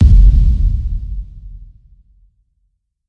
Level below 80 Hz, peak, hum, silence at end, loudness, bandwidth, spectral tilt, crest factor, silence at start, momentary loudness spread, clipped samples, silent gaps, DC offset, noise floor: -14 dBFS; 0 dBFS; none; 1.45 s; -14 LUFS; 0.8 kHz; -10 dB/octave; 12 dB; 0 s; 26 LU; under 0.1%; none; under 0.1%; -65 dBFS